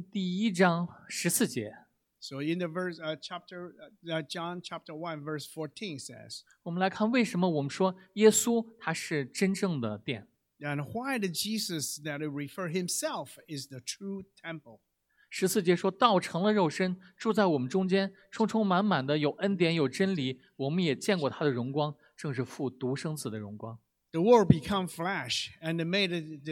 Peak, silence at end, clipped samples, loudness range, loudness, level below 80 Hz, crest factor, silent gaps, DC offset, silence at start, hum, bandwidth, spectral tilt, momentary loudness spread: -6 dBFS; 0 s; under 0.1%; 9 LU; -30 LUFS; -64 dBFS; 26 dB; none; under 0.1%; 0 s; none; 18 kHz; -5 dB/octave; 15 LU